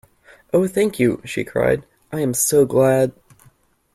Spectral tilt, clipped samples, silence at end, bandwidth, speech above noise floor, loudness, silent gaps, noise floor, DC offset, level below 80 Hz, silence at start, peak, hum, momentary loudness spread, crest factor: -5 dB/octave; under 0.1%; 0.85 s; 15.5 kHz; 38 dB; -19 LUFS; none; -56 dBFS; under 0.1%; -52 dBFS; 0.55 s; -4 dBFS; none; 9 LU; 16 dB